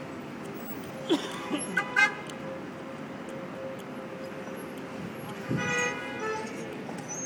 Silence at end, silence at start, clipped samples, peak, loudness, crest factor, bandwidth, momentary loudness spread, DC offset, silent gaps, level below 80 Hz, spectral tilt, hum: 0 s; 0 s; under 0.1%; -8 dBFS; -32 LUFS; 24 dB; 19.5 kHz; 13 LU; under 0.1%; none; -68 dBFS; -4 dB/octave; none